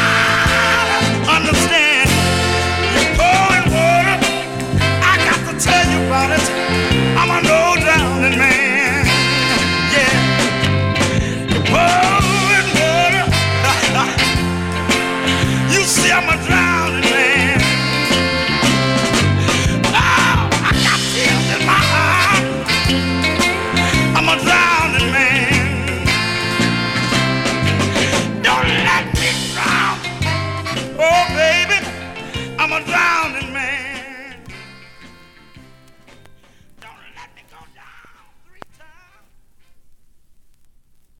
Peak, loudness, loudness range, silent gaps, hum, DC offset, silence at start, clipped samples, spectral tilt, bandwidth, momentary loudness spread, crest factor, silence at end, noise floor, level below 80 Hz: -2 dBFS; -14 LUFS; 4 LU; none; none; under 0.1%; 0 s; under 0.1%; -3.5 dB/octave; 16.5 kHz; 6 LU; 14 dB; 1.25 s; -49 dBFS; -32 dBFS